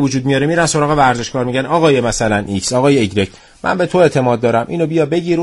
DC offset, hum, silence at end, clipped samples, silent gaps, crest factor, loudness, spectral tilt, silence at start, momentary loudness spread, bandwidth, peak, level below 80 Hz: under 0.1%; none; 0 s; under 0.1%; none; 14 dB; -14 LUFS; -5 dB/octave; 0 s; 6 LU; 11.5 kHz; 0 dBFS; -40 dBFS